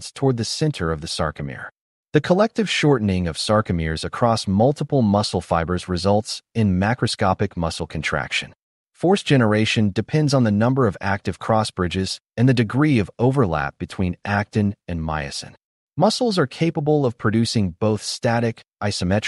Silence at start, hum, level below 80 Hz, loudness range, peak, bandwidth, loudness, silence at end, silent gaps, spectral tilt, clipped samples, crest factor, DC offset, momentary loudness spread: 0 s; none; -44 dBFS; 3 LU; -4 dBFS; 11.5 kHz; -21 LUFS; 0 s; 1.81-2.04 s, 8.62-8.86 s, 15.64-15.88 s; -6 dB/octave; under 0.1%; 16 dB; under 0.1%; 8 LU